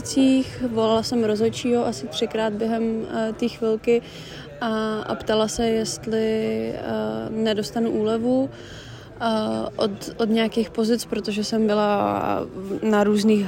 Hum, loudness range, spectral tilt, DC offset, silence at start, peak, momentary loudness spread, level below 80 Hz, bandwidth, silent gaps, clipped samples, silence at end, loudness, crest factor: none; 2 LU; -5 dB/octave; under 0.1%; 0 s; -8 dBFS; 7 LU; -52 dBFS; 16 kHz; none; under 0.1%; 0 s; -23 LUFS; 14 dB